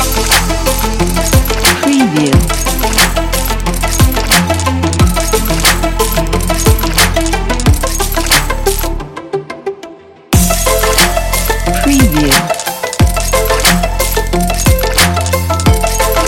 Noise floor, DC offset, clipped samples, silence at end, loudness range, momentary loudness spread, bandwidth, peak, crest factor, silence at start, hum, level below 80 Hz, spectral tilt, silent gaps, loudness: -33 dBFS; under 0.1%; 0.2%; 0 s; 3 LU; 6 LU; 17.5 kHz; 0 dBFS; 12 dB; 0 s; none; -16 dBFS; -3.5 dB/octave; none; -11 LUFS